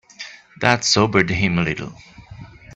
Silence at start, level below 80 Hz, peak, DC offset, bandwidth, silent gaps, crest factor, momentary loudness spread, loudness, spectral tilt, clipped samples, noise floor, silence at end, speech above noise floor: 0.2 s; -46 dBFS; 0 dBFS; under 0.1%; 8.4 kHz; none; 20 dB; 20 LU; -18 LUFS; -4 dB/octave; under 0.1%; -40 dBFS; 0 s; 21 dB